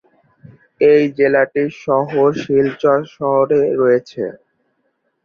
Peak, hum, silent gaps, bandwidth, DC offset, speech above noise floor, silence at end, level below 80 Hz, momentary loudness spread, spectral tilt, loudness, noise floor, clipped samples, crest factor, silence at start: -2 dBFS; none; none; 6.8 kHz; under 0.1%; 52 dB; 0.95 s; -58 dBFS; 6 LU; -7.5 dB/octave; -15 LUFS; -67 dBFS; under 0.1%; 14 dB; 0.8 s